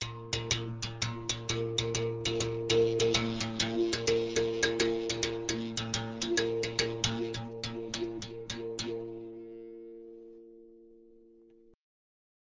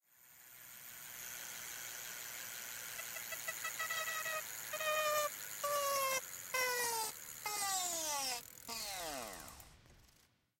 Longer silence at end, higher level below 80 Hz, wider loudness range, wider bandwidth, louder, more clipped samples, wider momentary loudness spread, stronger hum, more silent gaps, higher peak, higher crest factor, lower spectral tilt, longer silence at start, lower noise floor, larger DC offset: first, 1.3 s vs 0.55 s; first, -56 dBFS vs -74 dBFS; first, 13 LU vs 7 LU; second, 7.8 kHz vs 17 kHz; first, -32 LUFS vs -39 LUFS; neither; about the same, 17 LU vs 15 LU; neither; neither; first, -12 dBFS vs -24 dBFS; about the same, 22 dB vs 18 dB; first, -3.5 dB/octave vs 0.5 dB/octave; second, 0 s vs 0.2 s; second, -60 dBFS vs -72 dBFS; neither